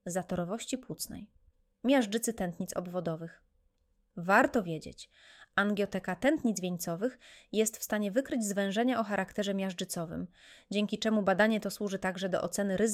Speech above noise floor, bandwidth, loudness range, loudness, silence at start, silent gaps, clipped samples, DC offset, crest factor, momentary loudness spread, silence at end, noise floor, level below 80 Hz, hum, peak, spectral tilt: 41 dB; 16 kHz; 3 LU; -32 LUFS; 0.05 s; none; under 0.1%; under 0.1%; 22 dB; 13 LU; 0 s; -73 dBFS; -64 dBFS; none; -12 dBFS; -4.5 dB/octave